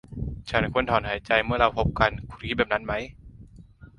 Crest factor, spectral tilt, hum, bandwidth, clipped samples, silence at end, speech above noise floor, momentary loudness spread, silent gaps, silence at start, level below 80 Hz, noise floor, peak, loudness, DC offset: 22 dB; -6.5 dB/octave; none; 11 kHz; under 0.1%; 0.15 s; 24 dB; 12 LU; none; 0.1 s; -40 dBFS; -49 dBFS; -4 dBFS; -25 LUFS; under 0.1%